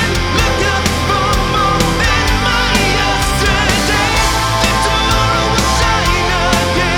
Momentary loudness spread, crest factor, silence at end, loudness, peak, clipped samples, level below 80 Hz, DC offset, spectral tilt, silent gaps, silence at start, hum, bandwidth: 2 LU; 12 dB; 0 s; -13 LUFS; 0 dBFS; under 0.1%; -20 dBFS; under 0.1%; -3.5 dB/octave; none; 0 s; none; 19.5 kHz